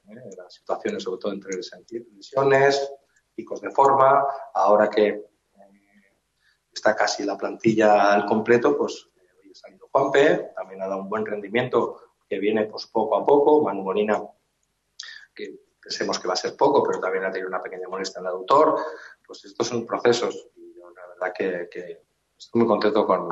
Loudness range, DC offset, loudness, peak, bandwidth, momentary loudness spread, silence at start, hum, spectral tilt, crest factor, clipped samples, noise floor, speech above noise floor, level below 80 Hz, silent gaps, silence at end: 5 LU; under 0.1%; -22 LUFS; -4 dBFS; 8 kHz; 20 LU; 0.1 s; none; -4.5 dB/octave; 18 dB; under 0.1%; -73 dBFS; 50 dB; -70 dBFS; none; 0 s